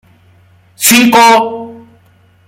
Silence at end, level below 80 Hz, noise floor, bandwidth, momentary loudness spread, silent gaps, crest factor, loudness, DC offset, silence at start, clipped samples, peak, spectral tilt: 0.7 s; -54 dBFS; -47 dBFS; over 20 kHz; 20 LU; none; 12 dB; -7 LUFS; under 0.1%; 0.8 s; 0.1%; 0 dBFS; -2 dB/octave